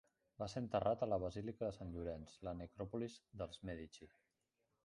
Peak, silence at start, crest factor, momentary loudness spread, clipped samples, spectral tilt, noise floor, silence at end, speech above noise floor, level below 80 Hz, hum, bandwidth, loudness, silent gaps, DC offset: -24 dBFS; 0.4 s; 22 dB; 11 LU; under 0.1%; -7 dB/octave; -87 dBFS; 0.75 s; 42 dB; -62 dBFS; none; 11.5 kHz; -45 LUFS; none; under 0.1%